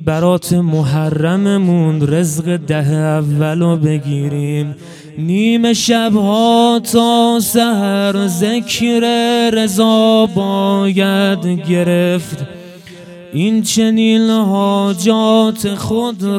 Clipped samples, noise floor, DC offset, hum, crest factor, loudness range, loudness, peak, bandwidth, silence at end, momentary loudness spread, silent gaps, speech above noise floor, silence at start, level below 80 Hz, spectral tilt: under 0.1%; -34 dBFS; under 0.1%; none; 12 dB; 3 LU; -13 LUFS; 0 dBFS; 16.5 kHz; 0 s; 7 LU; none; 21 dB; 0 s; -52 dBFS; -5.5 dB/octave